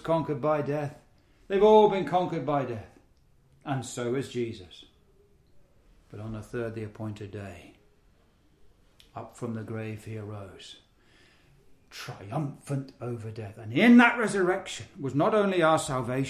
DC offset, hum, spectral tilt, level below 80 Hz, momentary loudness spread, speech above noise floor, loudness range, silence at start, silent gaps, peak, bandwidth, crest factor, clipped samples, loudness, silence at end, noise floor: under 0.1%; none; -6 dB/octave; -60 dBFS; 23 LU; 36 dB; 16 LU; 0.05 s; none; -6 dBFS; 13.5 kHz; 22 dB; under 0.1%; -27 LUFS; 0 s; -63 dBFS